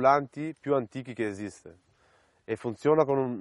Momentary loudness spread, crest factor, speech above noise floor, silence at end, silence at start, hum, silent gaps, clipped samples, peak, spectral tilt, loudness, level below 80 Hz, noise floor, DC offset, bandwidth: 14 LU; 20 dB; 37 dB; 0 s; 0 s; none; none; under 0.1%; -8 dBFS; -7 dB/octave; -29 LUFS; -68 dBFS; -65 dBFS; under 0.1%; 11.5 kHz